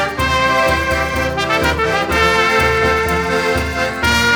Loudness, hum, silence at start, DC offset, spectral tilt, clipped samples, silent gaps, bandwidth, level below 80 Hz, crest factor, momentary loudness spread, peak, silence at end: -15 LUFS; none; 0 s; under 0.1%; -4 dB/octave; under 0.1%; none; over 20 kHz; -28 dBFS; 14 dB; 5 LU; 0 dBFS; 0 s